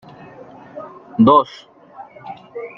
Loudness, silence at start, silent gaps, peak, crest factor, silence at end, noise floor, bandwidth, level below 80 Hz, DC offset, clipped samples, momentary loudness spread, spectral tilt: -15 LUFS; 0.75 s; none; -2 dBFS; 18 dB; 0.1 s; -40 dBFS; 6.4 kHz; -58 dBFS; under 0.1%; under 0.1%; 26 LU; -8.5 dB/octave